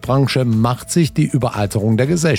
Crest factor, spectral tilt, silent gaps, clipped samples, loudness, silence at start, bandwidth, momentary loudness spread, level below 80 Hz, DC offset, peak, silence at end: 12 dB; -6 dB/octave; none; under 0.1%; -17 LUFS; 0 s; 16.5 kHz; 3 LU; -42 dBFS; under 0.1%; -4 dBFS; 0 s